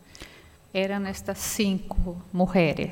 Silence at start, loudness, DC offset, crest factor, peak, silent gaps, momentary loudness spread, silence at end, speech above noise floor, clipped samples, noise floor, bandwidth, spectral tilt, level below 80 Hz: 0.1 s; -27 LUFS; under 0.1%; 18 dB; -10 dBFS; none; 18 LU; 0 s; 24 dB; under 0.1%; -50 dBFS; 17 kHz; -5 dB/octave; -38 dBFS